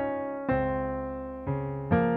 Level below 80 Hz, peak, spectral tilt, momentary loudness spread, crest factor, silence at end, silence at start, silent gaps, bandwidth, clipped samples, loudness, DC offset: -46 dBFS; -12 dBFS; -11.5 dB/octave; 7 LU; 18 dB; 0 s; 0 s; none; 4.5 kHz; under 0.1%; -31 LUFS; under 0.1%